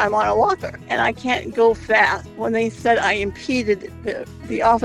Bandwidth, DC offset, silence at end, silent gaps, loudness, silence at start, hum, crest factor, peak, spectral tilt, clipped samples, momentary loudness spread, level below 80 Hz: 12 kHz; under 0.1%; 0 s; none; -20 LUFS; 0 s; none; 16 dB; -2 dBFS; -4.5 dB/octave; under 0.1%; 11 LU; -44 dBFS